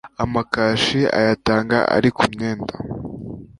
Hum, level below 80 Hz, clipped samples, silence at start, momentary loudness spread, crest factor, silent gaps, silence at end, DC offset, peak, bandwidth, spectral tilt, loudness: none; -44 dBFS; under 0.1%; 0.05 s; 13 LU; 18 dB; none; 0.15 s; under 0.1%; -2 dBFS; 11.5 kHz; -5.5 dB/octave; -19 LUFS